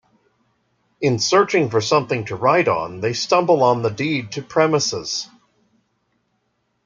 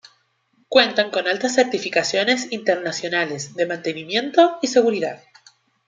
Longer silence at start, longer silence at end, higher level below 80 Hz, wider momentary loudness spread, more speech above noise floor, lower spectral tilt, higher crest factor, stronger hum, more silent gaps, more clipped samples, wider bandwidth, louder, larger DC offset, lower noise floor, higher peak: first, 1 s vs 0.7 s; first, 1.6 s vs 0.7 s; first, -62 dBFS vs -72 dBFS; about the same, 9 LU vs 9 LU; first, 51 dB vs 44 dB; first, -4.5 dB/octave vs -3 dB/octave; about the same, 18 dB vs 20 dB; neither; neither; neither; about the same, 9.2 kHz vs 9.4 kHz; about the same, -19 LUFS vs -20 LUFS; neither; first, -69 dBFS vs -64 dBFS; about the same, -2 dBFS vs 0 dBFS